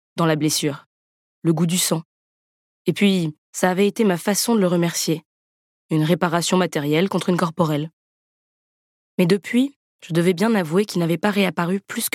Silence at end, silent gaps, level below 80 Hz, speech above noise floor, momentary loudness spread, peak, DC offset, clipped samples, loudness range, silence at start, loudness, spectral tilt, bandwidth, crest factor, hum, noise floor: 0.05 s; 0.86-1.42 s, 2.05-2.85 s, 3.38-3.53 s, 5.25-5.89 s, 7.93-9.18 s, 9.76-9.99 s; -70 dBFS; over 70 dB; 7 LU; -2 dBFS; under 0.1%; under 0.1%; 2 LU; 0.15 s; -20 LUFS; -5 dB/octave; 17 kHz; 18 dB; none; under -90 dBFS